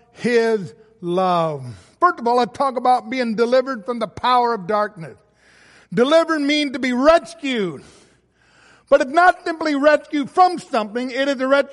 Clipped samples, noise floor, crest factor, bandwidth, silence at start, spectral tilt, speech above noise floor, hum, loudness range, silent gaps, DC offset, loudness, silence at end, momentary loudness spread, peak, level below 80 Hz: under 0.1%; -57 dBFS; 16 dB; 11.5 kHz; 0.2 s; -5 dB/octave; 39 dB; none; 2 LU; none; under 0.1%; -18 LUFS; 0 s; 11 LU; -2 dBFS; -56 dBFS